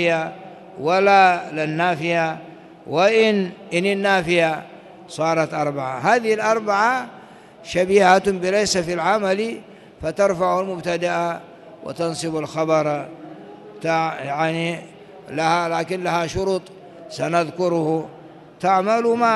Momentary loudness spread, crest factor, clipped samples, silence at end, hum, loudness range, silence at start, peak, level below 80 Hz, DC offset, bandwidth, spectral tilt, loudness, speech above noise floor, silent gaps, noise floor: 18 LU; 18 dB; under 0.1%; 0 s; none; 5 LU; 0 s; -2 dBFS; -54 dBFS; under 0.1%; 12 kHz; -4.5 dB/octave; -20 LUFS; 20 dB; none; -39 dBFS